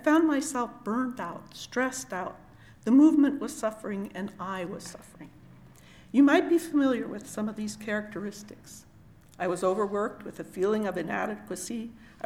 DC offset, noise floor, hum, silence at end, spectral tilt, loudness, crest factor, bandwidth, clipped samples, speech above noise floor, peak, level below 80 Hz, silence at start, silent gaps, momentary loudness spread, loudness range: under 0.1%; -54 dBFS; none; 0.2 s; -5 dB/octave; -28 LUFS; 18 dB; 15 kHz; under 0.1%; 26 dB; -10 dBFS; -64 dBFS; 0 s; none; 20 LU; 5 LU